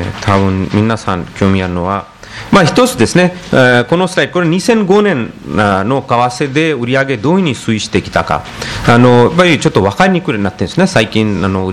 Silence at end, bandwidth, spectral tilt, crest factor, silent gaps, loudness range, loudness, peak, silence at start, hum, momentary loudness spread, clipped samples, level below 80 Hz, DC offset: 0 s; 13.5 kHz; -5.5 dB/octave; 12 dB; none; 2 LU; -11 LUFS; 0 dBFS; 0 s; none; 8 LU; 0.6%; -38 dBFS; under 0.1%